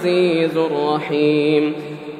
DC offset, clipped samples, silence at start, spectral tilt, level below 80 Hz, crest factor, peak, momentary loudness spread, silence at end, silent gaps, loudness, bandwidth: under 0.1%; under 0.1%; 0 s; -7 dB/octave; -70 dBFS; 14 dB; -4 dBFS; 5 LU; 0 s; none; -18 LUFS; 10.5 kHz